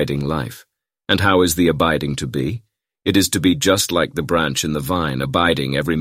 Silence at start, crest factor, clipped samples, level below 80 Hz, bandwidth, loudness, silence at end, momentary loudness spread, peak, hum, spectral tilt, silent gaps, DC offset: 0 s; 18 dB; under 0.1%; -40 dBFS; 16 kHz; -18 LUFS; 0 s; 10 LU; -2 dBFS; none; -4.5 dB/octave; none; under 0.1%